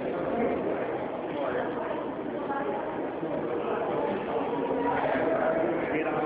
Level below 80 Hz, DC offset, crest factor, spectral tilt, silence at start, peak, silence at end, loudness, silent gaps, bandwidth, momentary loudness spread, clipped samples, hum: -60 dBFS; under 0.1%; 14 dB; -5 dB/octave; 0 s; -14 dBFS; 0 s; -30 LUFS; none; 4 kHz; 6 LU; under 0.1%; none